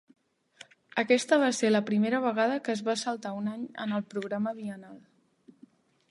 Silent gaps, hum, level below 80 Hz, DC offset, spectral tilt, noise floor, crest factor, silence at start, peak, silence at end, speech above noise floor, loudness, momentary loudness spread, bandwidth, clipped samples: none; none; -82 dBFS; under 0.1%; -4.5 dB/octave; -60 dBFS; 22 dB; 0.95 s; -8 dBFS; 1.1 s; 31 dB; -29 LUFS; 11 LU; 11.5 kHz; under 0.1%